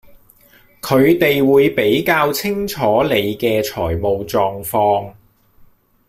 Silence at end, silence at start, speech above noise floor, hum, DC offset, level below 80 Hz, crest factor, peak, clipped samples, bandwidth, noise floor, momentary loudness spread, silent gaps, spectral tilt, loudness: 0.95 s; 0.85 s; 35 dB; none; under 0.1%; -46 dBFS; 14 dB; -2 dBFS; under 0.1%; 16 kHz; -50 dBFS; 8 LU; none; -5.5 dB/octave; -16 LUFS